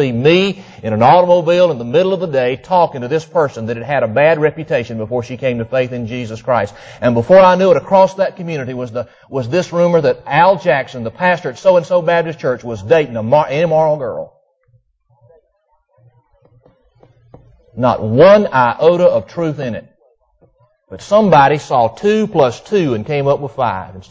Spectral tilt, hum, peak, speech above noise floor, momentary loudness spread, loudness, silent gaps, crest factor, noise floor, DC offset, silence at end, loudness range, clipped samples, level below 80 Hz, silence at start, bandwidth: -6.5 dB/octave; none; 0 dBFS; 48 dB; 13 LU; -14 LUFS; none; 14 dB; -61 dBFS; under 0.1%; 0.1 s; 4 LU; under 0.1%; -48 dBFS; 0 s; 8 kHz